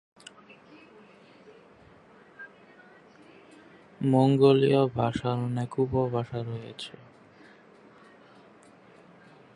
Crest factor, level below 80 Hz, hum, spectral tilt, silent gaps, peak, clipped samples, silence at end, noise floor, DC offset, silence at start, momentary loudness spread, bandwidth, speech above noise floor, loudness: 22 dB; -62 dBFS; none; -8 dB/octave; none; -6 dBFS; under 0.1%; 2.65 s; -55 dBFS; under 0.1%; 2.4 s; 27 LU; 10.5 kHz; 30 dB; -26 LUFS